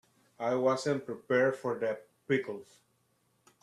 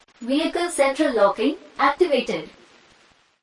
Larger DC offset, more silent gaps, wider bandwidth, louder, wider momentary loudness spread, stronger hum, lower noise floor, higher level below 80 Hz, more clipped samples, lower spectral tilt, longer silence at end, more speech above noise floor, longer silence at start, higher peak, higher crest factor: neither; neither; about the same, 12.5 kHz vs 11.5 kHz; second, -32 LUFS vs -21 LUFS; first, 12 LU vs 8 LU; neither; first, -73 dBFS vs -58 dBFS; second, -78 dBFS vs -58 dBFS; neither; first, -5.5 dB/octave vs -3.5 dB/octave; about the same, 1 s vs 0.95 s; first, 42 dB vs 37 dB; first, 0.4 s vs 0.2 s; second, -16 dBFS vs -6 dBFS; about the same, 18 dB vs 16 dB